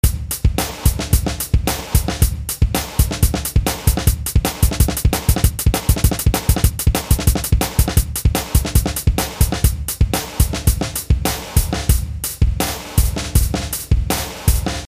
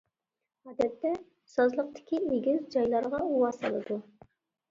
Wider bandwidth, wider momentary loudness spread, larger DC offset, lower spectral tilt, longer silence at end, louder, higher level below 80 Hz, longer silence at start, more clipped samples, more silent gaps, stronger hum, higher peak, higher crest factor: first, 16 kHz vs 7.6 kHz; second, 3 LU vs 9 LU; first, 0.2% vs under 0.1%; second, -4.5 dB/octave vs -6.5 dB/octave; second, 0 s vs 0.7 s; first, -18 LUFS vs -30 LUFS; first, -20 dBFS vs -68 dBFS; second, 0.05 s vs 0.65 s; neither; neither; neither; first, 0 dBFS vs -14 dBFS; about the same, 16 dB vs 16 dB